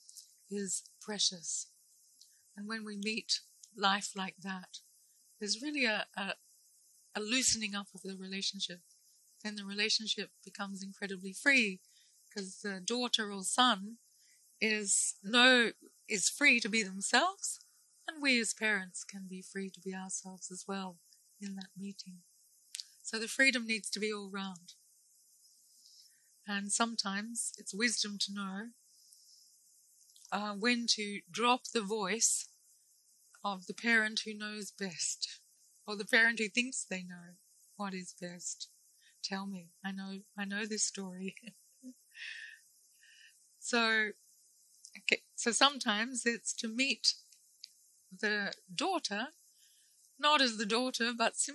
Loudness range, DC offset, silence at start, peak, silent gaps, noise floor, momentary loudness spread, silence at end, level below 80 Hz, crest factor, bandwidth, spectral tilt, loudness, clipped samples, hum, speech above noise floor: 10 LU; under 0.1%; 0.15 s; -10 dBFS; none; -68 dBFS; 18 LU; 0 s; -82 dBFS; 28 dB; 12 kHz; -1.5 dB/octave; -33 LUFS; under 0.1%; none; 33 dB